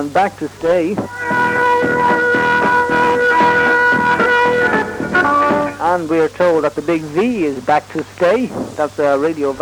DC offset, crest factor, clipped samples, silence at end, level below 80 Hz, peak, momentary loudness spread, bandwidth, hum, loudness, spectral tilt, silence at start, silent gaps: under 0.1%; 12 dB; under 0.1%; 0 s; -48 dBFS; -2 dBFS; 7 LU; 19 kHz; none; -14 LUFS; -5.5 dB/octave; 0 s; none